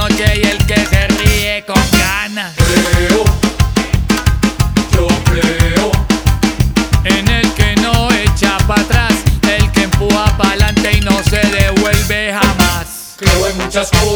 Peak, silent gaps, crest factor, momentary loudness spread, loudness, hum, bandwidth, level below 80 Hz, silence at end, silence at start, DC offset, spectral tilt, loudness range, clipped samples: 0 dBFS; none; 12 dB; 3 LU; -12 LUFS; none; over 20 kHz; -18 dBFS; 0 s; 0 s; under 0.1%; -4.5 dB/octave; 1 LU; under 0.1%